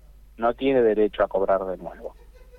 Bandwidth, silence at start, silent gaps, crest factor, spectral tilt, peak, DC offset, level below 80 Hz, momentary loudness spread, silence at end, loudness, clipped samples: 4.3 kHz; 0.4 s; none; 14 dB; -7.5 dB/octave; -10 dBFS; under 0.1%; -48 dBFS; 18 LU; 0.45 s; -23 LUFS; under 0.1%